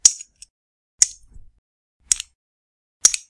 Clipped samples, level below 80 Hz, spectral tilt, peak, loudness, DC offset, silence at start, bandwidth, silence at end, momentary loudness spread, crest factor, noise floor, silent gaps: 0.1%; -54 dBFS; 3 dB/octave; 0 dBFS; -18 LUFS; under 0.1%; 0.05 s; 12 kHz; 0.1 s; 19 LU; 24 dB; -43 dBFS; 0.50-0.98 s, 1.58-2.00 s, 2.35-3.00 s